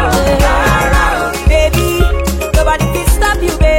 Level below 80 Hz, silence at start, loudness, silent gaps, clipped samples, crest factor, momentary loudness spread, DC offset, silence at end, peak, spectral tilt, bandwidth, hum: -14 dBFS; 0 s; -12 LUFS; none; under 0.1%; 10 dB; 3 LU; under 0.1%; 0 s; 0 dBFS; -5 dB/octave; 16.5 kHz; none